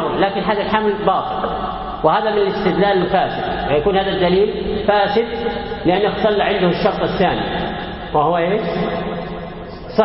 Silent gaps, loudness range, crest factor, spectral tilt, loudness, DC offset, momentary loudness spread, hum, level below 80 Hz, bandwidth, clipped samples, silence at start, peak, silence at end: none; 2 LU; 16 dB; -11 dB/octave; -18 LUFS; under 0.1%; 8 LU; none; -38 dBFS; 5.8 kHz; under 0.1%; 0 s; 0 dBFS; 0 s